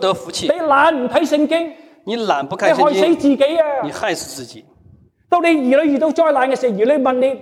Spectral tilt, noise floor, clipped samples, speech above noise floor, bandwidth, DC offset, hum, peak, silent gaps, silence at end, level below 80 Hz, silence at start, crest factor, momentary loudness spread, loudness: -4.5 dB/octave; -49 dBFS; under 0.1%; 34 dB; 15 kHz; under 0.1%; none; -2 dBFS; none; 0 s; -58 dBFS; 0 s; 14 dB; 10 LU; -16 LUFS